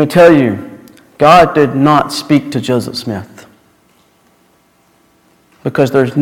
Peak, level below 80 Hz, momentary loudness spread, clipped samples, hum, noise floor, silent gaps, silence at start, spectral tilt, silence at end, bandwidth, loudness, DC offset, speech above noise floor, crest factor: 0 dBFS; -46 dBFS; 17 LU; 0.7%; none; -52 dBFS; none; 0 s; -6 dB/octave; 0 s; 16.5 kHz; -11 LUFS; under 0.1%; 42 dB; 12 dB